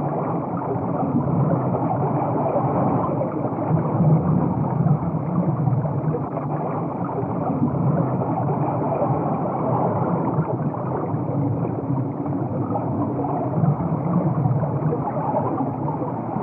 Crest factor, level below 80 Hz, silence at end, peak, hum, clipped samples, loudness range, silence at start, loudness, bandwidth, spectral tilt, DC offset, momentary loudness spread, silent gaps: 14 dB; -52 dBFS; 0 s; -8 dBFS; none; under 0.1%; 3 LU; 0 s; -23 LUFS; 2.8 kHz; -13.5 dB/octave; under 0.1%; 5 LU; none